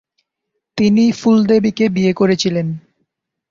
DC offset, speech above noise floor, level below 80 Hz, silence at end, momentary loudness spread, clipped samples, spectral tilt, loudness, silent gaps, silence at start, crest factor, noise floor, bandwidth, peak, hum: under 0.1%; 62 dB; -54 dBFS; 0.7 s; 11 LU; under 0.1%; -6.5 dB/octave; -14 LUFS; none; 0.75 s; 14 dB; -76 dBFS; 7.6 kHz; -2 dBFS; none